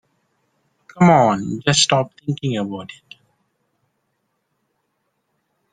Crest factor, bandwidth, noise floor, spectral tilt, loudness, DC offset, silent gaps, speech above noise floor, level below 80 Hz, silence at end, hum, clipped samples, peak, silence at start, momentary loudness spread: 20 dB; 9.6 kHz; -72 dBFS; -4.5 dB/octave; -17 LUFS; under 0.1%; none; 54 dB; -58 dBFS; 2.8 s; none; under 0.1%; -2 dBFS; 0.95 s; 15 LU